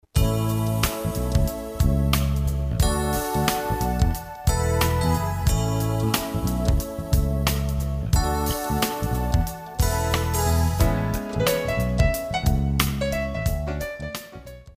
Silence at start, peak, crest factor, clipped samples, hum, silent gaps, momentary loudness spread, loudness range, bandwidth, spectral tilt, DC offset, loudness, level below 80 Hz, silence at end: 0.15 s; -2 dBFS; 22 dB; under 0.1%; none; none; 5 LU; 1 LU; 16 kHz; -5.5 dB/octave; under 0.1%; -24 LUFS; -28 dBFS; 0.05 s